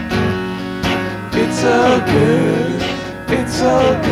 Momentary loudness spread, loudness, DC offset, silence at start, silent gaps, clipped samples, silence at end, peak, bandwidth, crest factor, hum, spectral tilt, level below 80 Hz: 8 LU; -16 LUFS; under 0.1%; 0 s; none; under 0.1%; 0 s; -2 dBFS; 15.5 kHz; 14 dB; none; -5.5 dB/octave; -36 dBFS